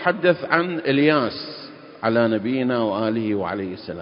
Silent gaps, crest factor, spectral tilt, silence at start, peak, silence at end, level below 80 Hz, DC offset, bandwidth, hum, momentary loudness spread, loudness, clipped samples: none; 20 dB; -11 dB/octave; 0 s; -2 dBFS; 0 s; -58 dBFS; under 0.1%; 5.4 kHz; none; 13 LU; -21 LUFS; under 0.1%